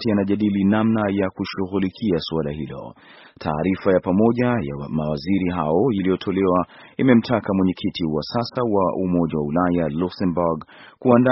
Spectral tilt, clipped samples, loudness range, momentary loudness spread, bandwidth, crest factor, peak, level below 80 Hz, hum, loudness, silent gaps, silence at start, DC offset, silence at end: -6.5 dB/octave; under 0.1%; 2 LU; 8 LU; 6 kHz; 20 dB; 0 dBFS; -48 dBFS; none; -21 LUFS; none; 0 s; under 0.1%; 0 s